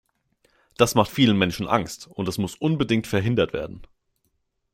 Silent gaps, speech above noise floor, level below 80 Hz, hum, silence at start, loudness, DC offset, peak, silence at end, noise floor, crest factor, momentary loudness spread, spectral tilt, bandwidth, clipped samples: none; 50 dB; -52 dBFS; none; 0.8 s; -23 LUFS; under 0.1%; -2 dBFS; 0.9 s; -73 dBFS; 22 dB; 11 LU; -5.5 dB/octave; 16.5 kHz; under 0.1%